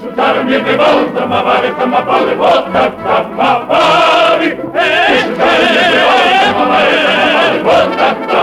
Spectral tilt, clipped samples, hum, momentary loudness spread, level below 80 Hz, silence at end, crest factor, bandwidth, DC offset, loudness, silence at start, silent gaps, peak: -4 dB/octave; under 0.1%; none; 5 LU; -46 dBFS; 0 s; 8 dB; 14 kHz; under 0.1%; -10 LUFS; 0 s; none; -2 dBFS